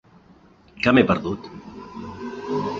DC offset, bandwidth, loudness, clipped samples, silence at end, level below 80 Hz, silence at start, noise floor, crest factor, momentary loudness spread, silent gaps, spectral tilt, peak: under 0.1%; 7.2 kHz; -22 LUFS; under 0.1%; 0 s; -50 dBFS; 0.75 s; -52 dBFS; 22 dB; 21 LU; none; -7 dB/octave; -2 dBFS